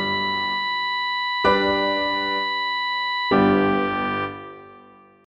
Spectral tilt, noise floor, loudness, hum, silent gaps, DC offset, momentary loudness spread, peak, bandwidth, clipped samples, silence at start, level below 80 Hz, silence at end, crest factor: -6 dB/octave; -49 dBFS; -21 LUFS; none; none; under 0.1%; 7 LU; -6 dBFS; 11.5 kHz; under 0.1%; 0 s; -54 dBFS; 0.6 s; 18 dB